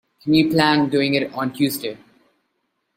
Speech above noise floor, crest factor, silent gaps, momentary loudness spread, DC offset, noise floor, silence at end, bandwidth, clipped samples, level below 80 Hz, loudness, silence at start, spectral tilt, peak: 54 dB; 20 dB; none; 10 LU; under 0.1%; -72 dBFS; 1 s; 16.5 kHz; under 0.1%; -58 dBFS; -19 LUFS; 0.25 s; -5.5 dB/octave; -2 dBFS